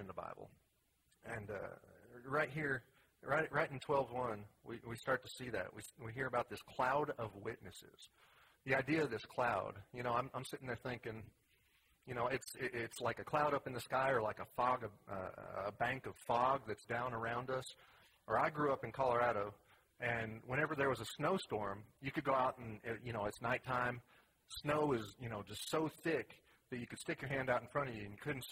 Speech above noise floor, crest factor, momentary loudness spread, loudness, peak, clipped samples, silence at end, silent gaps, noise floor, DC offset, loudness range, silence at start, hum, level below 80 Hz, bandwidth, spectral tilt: 38 dB; 22 dB; 13 LU; -40 LUFS; -20 dBFS; under 0.1%; 0 s; none; -79 dBFS; under 0.1%; 4 LU; 0 s; none; -70 dBFS; 16 kHz; -5.5 dB/octave